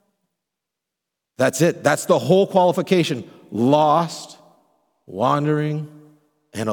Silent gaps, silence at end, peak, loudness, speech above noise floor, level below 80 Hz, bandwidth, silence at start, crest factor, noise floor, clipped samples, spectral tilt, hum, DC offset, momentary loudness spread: none; 0 s; -2 dBFS; -19 LUFS; 65 dB; -70 dBFS; 19 kHz; 1.4 s; 20 dB; -83 dBFS; under 0.1%; -5.5 dB/octave; none; under 0.1%; 17 LU